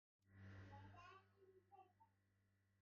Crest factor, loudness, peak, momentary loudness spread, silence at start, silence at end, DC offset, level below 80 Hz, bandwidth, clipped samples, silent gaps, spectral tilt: 16 dB; -64 LUFS; -52 dBFS; 5 LU; 0.2 s; 0 s; under 0.1%; -86 dBFS; 6.8 kHz; under 0.1%; none; -5.5 dB/octave